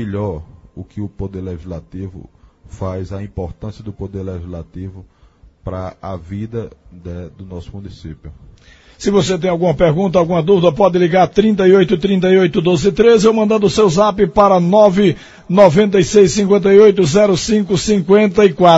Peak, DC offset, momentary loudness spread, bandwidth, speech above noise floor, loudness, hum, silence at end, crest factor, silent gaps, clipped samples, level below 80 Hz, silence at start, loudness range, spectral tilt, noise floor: 0 dBFS; under 0.1%; 20 LU; 8 kHz; 33 dB; -12 LUFS; none; 0 s; 14 dB; none; 0.1%; -40 dBFS; 0 s; 18 LU; -6 dB/octave; -46 dBFS